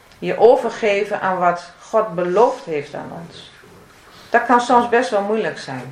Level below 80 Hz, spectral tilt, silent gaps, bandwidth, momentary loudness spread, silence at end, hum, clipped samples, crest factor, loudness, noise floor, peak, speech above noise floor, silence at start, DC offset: -60 dBFS; -5 dB/octave; none; 11 kHz; 16 LU; 0 s; none; under 0.1%; 18 dB; -17 LUFS; -45 dBFS; 0 dBFS; 27 dB; 0.2 s; under 0.1%